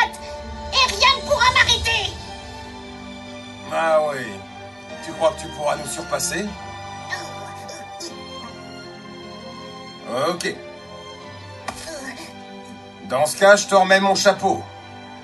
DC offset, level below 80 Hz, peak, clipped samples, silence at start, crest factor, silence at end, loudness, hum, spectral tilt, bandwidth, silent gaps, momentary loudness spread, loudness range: under 0.1%; -44 dBFS; 0 dBFS; under 0.1%; 0 s; 22 dB; 0 s; -19 LUFS; none; -2.5 dB/octave; 12.5 kHz; none; 22 LU; 11 LU